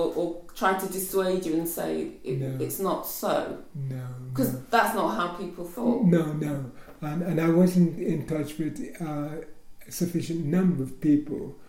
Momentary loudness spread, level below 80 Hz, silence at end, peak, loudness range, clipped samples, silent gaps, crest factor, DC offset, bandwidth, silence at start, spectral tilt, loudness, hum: 13 LU; -54 dBFS; 0 s; -8 dBFS; 4 LU; under 0.1%; none; 20 dB; under 0.1%; 16.5 kHz; 0 s; -6.5 dB/octave; -27 LUFS; none